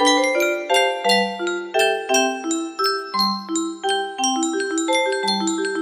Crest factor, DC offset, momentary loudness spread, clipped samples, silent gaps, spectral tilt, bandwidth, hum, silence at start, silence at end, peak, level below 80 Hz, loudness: 18 dB; under 0.1%; 6 LU; under 0.1%; none; -2 dB/octave; 15.5 kHz; none; 0 s; 0 s; -2 dBFS; -70 dBFS; -20 LUFS